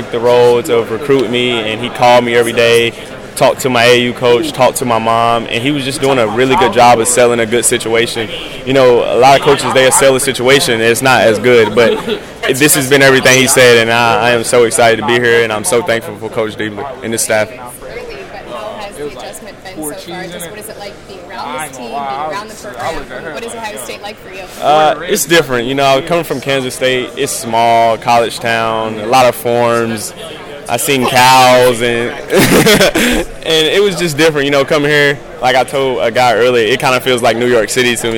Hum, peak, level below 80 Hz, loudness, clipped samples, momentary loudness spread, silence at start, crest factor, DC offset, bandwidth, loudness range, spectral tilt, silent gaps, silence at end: none; 0 dBFS; -38 dBFS; -10 LUFS; under 0.1%; 17 LU; 0 s; 12 dB; under 0.1%; 18 kHz; 14 LU; -3.5 dB/octave; none; 0 s